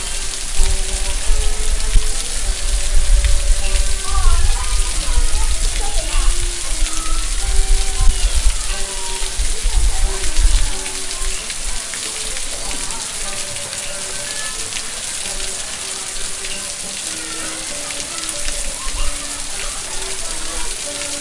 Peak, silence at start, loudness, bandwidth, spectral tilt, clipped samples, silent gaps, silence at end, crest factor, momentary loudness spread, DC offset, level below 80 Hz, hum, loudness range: 0 dBFS; 0 s; -21 LUFS; 11.5 kHz; -1.5 dB/octave; under 0.1%; none; 0 s; 16 dB; 4 LU; under 0.1%; -18 dBFS; none; 3 LU